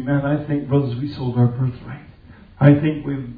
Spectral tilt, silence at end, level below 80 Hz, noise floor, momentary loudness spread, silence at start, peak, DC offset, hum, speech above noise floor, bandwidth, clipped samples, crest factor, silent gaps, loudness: -11.5 dB/octave; 0 s; -46 dBFS; -44 dBFS; 15 LU; 0 s; 0 dBFS; under 0.1%; none; 25 dB; 4.9 kHz; under 0.1%; 20 dB; none; -19 LUFS